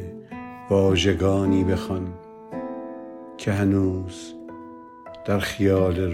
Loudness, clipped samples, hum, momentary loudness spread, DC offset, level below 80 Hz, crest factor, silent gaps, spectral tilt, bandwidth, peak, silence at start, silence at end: -23 LUFS; under 0.1%; none; 19 LU; under 0.1%; -52 dBFS; 18 dB; none; -6.5 dB/octave; 15 kHz; -6 dBFS; 0 s; 0 s